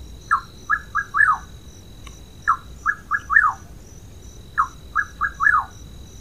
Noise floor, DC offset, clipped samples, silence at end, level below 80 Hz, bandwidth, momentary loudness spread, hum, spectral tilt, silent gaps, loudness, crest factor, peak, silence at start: -41 dBFS; 0.4%; under 0.1%; 0 s; -44 dBFS; 15.5 kHz; 24 LU; none; -3 dB/octave; none; -21 LUFS; 22 dB; -2 dBFS; 0 s